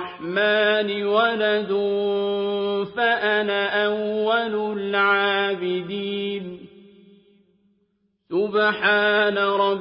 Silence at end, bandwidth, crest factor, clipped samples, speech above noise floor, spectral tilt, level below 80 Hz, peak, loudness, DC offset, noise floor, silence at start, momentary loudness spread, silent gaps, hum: 0 s; 5.6 kHz; 16 dB; under 0.1%; 47 dB; -9 dB/octave; -68 dBFS; -6 dBFS; -21 LUFS; under 0.1%; -69 dBFS; 0 s; 8 LU; none; none